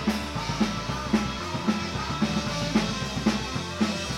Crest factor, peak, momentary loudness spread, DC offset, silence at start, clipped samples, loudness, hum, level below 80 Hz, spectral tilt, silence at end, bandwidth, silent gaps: 18 dB; -10 dBFS; 4 LU; under 0.1%; 0 s; under 0.1%; -27 LUFS; none; -42 dBFS; -4.5 dB/octave; 0 s; 15.5 kHz; none